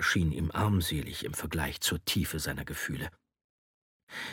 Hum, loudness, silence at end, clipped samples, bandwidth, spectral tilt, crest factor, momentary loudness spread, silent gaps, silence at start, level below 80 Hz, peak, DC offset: none; -32 LUFS; 0 s; under 0.1%; 17.5 kHz; -4 dB/octave; 18 dB; 10 LU; 3.44-4.07 s; 0 s; -46 dBFS; -16 dBFS; under 0.1%